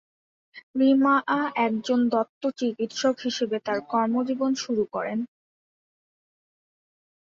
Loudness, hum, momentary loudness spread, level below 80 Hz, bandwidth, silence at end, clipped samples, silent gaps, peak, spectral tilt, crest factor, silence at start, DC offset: -25 LUFS; none; 9 LU; -72 dBFS; 7.6 kHz; 1.95 s; under 0.1%; 0.63-0.74 s, 2.29-2.41 s; -10 dBFS; -4.5 dB/octave; 16 dB; 0.55 s; under 0.1%